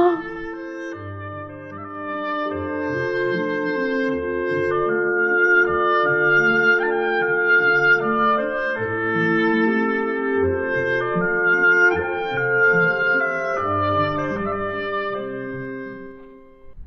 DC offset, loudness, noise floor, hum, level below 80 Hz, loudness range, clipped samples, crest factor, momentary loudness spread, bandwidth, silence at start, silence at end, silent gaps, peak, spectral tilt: under 0.1%; -19 LUFS; -43 dBFS; none; -50 dBFS; 8 LU; under 0.1%; 14 dB; 15 LU; 6.6 kHz; 0 s; 0 s; none; -6 dBFS; -7 dB/octave